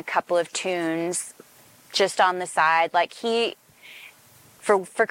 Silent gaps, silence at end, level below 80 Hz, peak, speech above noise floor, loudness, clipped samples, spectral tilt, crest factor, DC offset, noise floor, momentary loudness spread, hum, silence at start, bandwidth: none; 0.05 s; -80 dBFS; -6 dBFS; 30 dB; -23 LUFS; under 0.1%; -2.5 dB/octave; 20 dB; under 0.1%; -53 dBFS; 18 LU; none; 0.05 s; 17 kHz